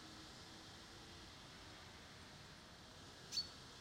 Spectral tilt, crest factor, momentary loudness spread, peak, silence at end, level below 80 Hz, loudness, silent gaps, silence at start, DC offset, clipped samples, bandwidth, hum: -2.5 dB/octave; 22 dB; 13 LU; -32 dBFS; 0 s; -70 dBFS; -52 LUFS; none; 0 s; under 0.1%; under 0.1%; 16 kHz; none